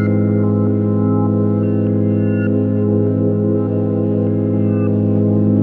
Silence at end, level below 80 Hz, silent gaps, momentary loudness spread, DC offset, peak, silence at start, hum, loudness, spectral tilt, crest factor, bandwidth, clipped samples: 0 s; -56 dBFS; none; 2 LU; under 0.1%; -4 dBFS; 0 s; none; -16 LUFS; -13.5 dB/octave; 12 dB; 2.9 kHz; under 0.1%